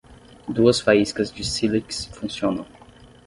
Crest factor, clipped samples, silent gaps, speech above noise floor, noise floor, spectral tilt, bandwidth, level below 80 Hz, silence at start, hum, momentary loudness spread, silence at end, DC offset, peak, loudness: 20 dB; under 0.1%; none; 27 dB; -48 dBFS; -4.5 dB/octave; 11.5 kHz; -48 dBFS; 0.1 s; none; 13 LU; 0.6 s; under 0.1%; -2 dBFS; -22 LUFS